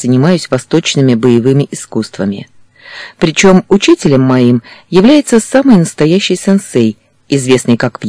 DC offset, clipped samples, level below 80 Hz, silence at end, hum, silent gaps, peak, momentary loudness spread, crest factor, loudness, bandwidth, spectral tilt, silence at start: 0.5%; 3%; -42 dBFS; 0 s; none; none; 0 dBFS; 10 LU; 10 dB; -10 LUFS; 11 kHz; -5.5 dB/octave; 0 s